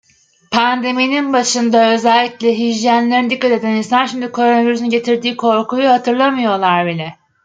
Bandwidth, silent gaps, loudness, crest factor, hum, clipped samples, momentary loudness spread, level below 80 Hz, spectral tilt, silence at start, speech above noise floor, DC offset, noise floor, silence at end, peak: 9.4 kHz; none; -14 LUFS; 12 dB; none; under 0.1%; 4 LU; -64 dBFS; -4 dB/octave; 0.5 s; 29 dB; under 0.1%; -43 dBFS; 0.3 s; -2 dBFS